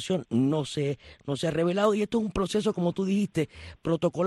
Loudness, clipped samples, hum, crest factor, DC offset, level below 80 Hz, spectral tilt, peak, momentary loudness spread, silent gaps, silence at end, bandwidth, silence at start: -28 LUFS; under 0.1%; none; 14 dB; under 0.1%; -52 dBFS; -6.5 dB/octave; -12 dBFS; 8 LU; none; 0 s; 12.5 kHz; 0 s